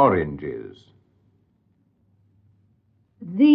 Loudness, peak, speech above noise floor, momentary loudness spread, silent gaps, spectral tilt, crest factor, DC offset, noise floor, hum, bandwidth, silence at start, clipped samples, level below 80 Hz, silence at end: -24 LUFS; -4 dBFS; 45 dB; 23 LU; none; -10 dB/octave; 20 dB; under 0.1%; -65 dBFS; none; 5.2 kHz; 0 s; under 0.1%; -52 dBFS; 0 s